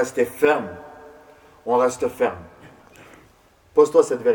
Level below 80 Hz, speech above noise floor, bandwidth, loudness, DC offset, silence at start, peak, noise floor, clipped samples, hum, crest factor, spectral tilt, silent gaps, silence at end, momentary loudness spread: -60 dBFS; 36 dB; 20 kHz; -20 LUFS; under 0.1%; 0 s; -2 dBFS; -55 dBFS; under 0.1%; none; 20 dB; -4.5 dB/octave; none; 0 s; 21 LU